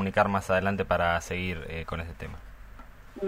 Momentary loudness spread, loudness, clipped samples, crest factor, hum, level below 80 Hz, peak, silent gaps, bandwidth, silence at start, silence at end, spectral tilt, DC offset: 17 LU; -28 LUFS; under 0.1%; 22 dB; none; -46 dBFS; -8 dBFS; none; 16 kHz; 0 s; 0 s; -5.5 dB/octave; under 0.1%